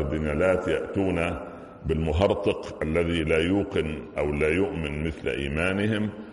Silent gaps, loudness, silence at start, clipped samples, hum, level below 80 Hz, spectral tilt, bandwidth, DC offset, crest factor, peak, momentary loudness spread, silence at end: none; -26 LUFS; 0 s; under 0.1%; none; -40 dBFS; -7 dB/octave; 11.5 kHz; under 0.1%; 16 dB; -8 dBFS; 7 LU; 0 s